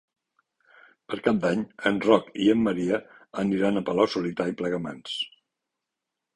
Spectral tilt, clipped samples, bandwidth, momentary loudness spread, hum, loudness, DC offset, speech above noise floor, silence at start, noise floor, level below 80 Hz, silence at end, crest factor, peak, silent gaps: -6 dB/octave; under 0.1%; 11 kHz; 10 LU; none; -26 LUFS; under 0.1%; 61 dB; 1.1 s; -85 dBFS; -62 dBFS; 1.1 s; 22 dB; -4 dBFS; none